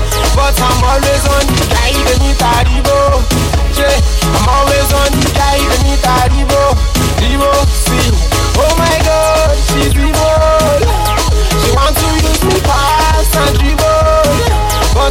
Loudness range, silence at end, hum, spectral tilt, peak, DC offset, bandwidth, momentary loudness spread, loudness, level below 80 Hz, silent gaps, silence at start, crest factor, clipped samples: 0 LU; 0 s; none; -4.5 dB/octave; -2 dBFS; under 0.1%; 16.5 kHz; 2 LU; -10 LUFS; -14 dBFS; none; 0 s; 8 dB; under 0.1%